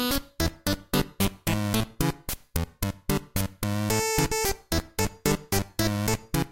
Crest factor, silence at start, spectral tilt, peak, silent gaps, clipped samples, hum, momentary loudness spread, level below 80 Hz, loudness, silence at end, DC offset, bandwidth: 20 dB; 0 s; -4.5 dB/octave; -8 dBFS; none; under 0.1%; none; 7 LU; -38 dBFS; -28 LUFS; 0.05 s; under 0.1%; 17 kHz